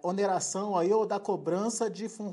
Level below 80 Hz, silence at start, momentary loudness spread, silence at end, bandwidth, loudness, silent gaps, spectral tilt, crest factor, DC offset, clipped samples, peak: -84 dBFS; 0.05 s; 6 LU; 0 s; 11.5 kHz; -30 LUFS; none; -4.5 dB/octave; 14 dB; under 0.1%; under 0.1%; -16 dBFS